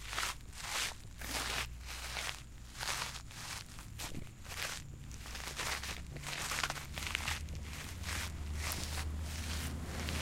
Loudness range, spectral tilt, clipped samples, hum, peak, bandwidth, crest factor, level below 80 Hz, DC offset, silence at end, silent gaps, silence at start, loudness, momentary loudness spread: 3 LU; -2.5 dB/octave; under 0.1%; none; -14 dBFS; 16.5 kHz; 28 dB; -48 dBFS; under 0.1%; 0 s; none; 0 s; -40 LUFS; 9 LU